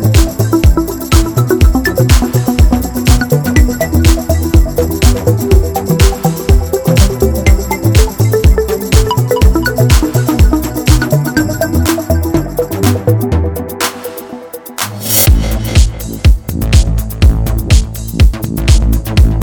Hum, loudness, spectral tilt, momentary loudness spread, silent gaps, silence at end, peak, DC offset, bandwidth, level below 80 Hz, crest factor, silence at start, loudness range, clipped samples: none; -11 LUFS; -5.5 dB/octave; 5 LU; none; 0 s; 0 dBFS; under 0.1%; 19.5 kHz; -12 dBFS; 10 dB; 0 s; 3 LU; 2%